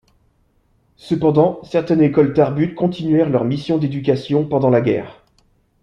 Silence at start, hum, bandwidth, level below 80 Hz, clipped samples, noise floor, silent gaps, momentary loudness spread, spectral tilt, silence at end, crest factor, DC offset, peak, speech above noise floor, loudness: 1.05 s; none; 7.2 kHz; -52 dBFS; under 0.1%; -60 dBFS; none; 6 LU; -9 dB/octave; 0.7 s; 16 dB; under 0.1%; 0 dBFS; 44 dB; -17 LUFS